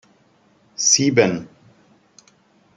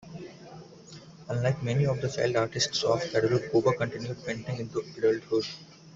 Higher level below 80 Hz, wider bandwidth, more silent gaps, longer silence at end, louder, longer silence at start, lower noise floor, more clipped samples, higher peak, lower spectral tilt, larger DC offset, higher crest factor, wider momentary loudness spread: about the same, -64 dBFS vs -60 dBFS; first, 11 kHz vs 8 kHz; neither; first, 1.3 s vs 0 s; first, -17 LUFS vs -28 LUFS; first, 0.8 s vs 0 s; first, -58 dBFS vs -49 dBFS; neither; first, -2 dBFS vs -10 dBFS; second, -3 dB/octave vs -5 dB/octave; neither; about the same, 20 dB vs 18 dB; second, 17 LU vs 21 LU